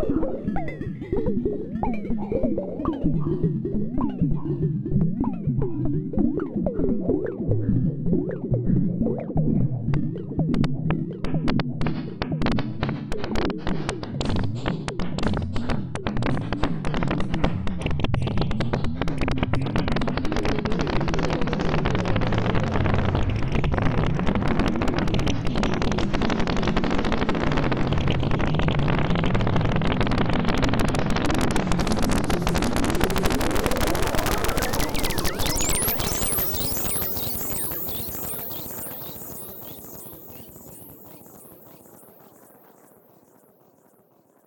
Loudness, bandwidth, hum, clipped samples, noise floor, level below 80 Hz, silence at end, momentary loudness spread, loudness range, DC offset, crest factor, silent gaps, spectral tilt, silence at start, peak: -25 LUFS; 18 kHz; none; under 0.1%; -59 dBFS; -32 dBFS; 2.5 s; 6 LU; 5 LU; under 0.1%; 20 dB; none; -5.5 dB/octave; 0 s; -4 dBFS